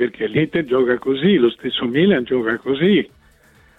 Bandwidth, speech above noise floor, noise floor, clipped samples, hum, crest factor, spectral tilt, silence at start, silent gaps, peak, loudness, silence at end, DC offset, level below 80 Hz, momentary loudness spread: 4.1 kHz; 35 dB; -52 dBFS; under 0.1%; none; 14 dB; -8 dB/octave; 0 s; none; -4 dBFS; -18 LUFS; 0.7 s; under 0.1%; -54 dBFS; 5 LU